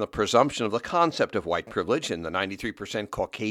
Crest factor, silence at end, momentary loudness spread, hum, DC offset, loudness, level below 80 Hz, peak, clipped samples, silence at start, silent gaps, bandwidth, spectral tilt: 20 dB; 0 s; 9 LU; none; under 0.1%; -26 LUFS; -54 dBFS; -6 dBFS; under 0.1%; 0 s; none; 15 kHz; -4.5 dB/octave